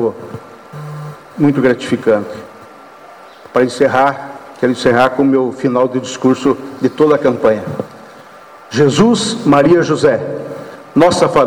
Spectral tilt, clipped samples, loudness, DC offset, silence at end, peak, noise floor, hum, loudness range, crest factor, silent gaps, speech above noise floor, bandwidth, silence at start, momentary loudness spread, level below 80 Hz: -5.5 dB/octave; under 0.1%; -13 LUFS; under 0.1%; 0 s; -2 dBFS; -37 dBFS; none; 4 LU; 12 dB; none; 25 dB; 18 kHz; 0 s; 19 LU; -48 dBFS